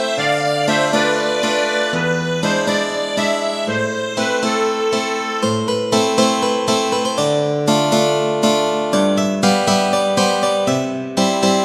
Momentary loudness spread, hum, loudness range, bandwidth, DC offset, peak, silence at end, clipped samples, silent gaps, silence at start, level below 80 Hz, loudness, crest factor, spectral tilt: 4 LU; none; 3 LU; 15 kHz; under 0.1%; 0 dBFS; 0 s; under 0.1%; none; 0 s; -60 dBFS; -17 LUFS; 16 dB; -4 dB/octave